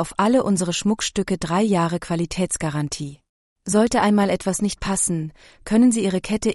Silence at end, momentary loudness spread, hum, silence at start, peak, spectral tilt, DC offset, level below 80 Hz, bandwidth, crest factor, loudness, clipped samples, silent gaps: 0 s; 10 LU; none; 0 s; -6 dBFS; -5 dB/octave; under 0.1%; -46 dBFS; 11.5 kHz; 14 dB; -21 LUFS; under 0.1%; 3.29-3.56 s